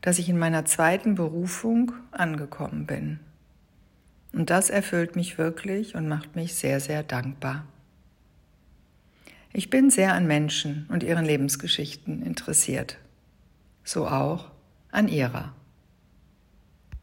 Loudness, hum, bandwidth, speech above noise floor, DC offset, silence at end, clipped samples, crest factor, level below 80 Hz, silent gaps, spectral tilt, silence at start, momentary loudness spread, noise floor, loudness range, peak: -25 LUFS; none; 16.5 kHz; 34 dB; under 0.1%; 0.05 s; under 0.1%; 20 dB; -56 dBFS; none; -4 dB/octave; 0.05 s; 12 LU; -59 dBFS; 6 LU; -8 dBFS